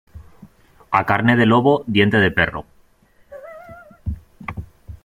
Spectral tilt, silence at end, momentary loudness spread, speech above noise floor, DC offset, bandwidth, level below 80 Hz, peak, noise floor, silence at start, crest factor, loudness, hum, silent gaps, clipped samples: -7.5 dB/octave; 0.1 s; 24 LU; 39 dB; under 0.1%; 15 kHz; -42 dBFS; -2 dBFS; -55 dBFS; 0.15 s; 18 dB; -16 LUFS; none; none; under 0.1%